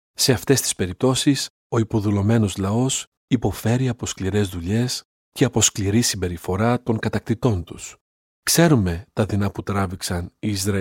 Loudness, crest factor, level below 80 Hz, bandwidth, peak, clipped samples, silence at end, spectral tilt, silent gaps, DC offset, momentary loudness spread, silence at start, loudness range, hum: -21 LUFS; 20 dB; -46 dBFS; 17 kHz; -2 dBFS; under 0.1%; 0 s; -4.5 dB/octave; 1.50-1.70 s, 3.07-3.28 s, 5.05-5.32 s, 8.01-8.43 s; under 0.1%; 9 LU; 0.2 s; 1 LU; none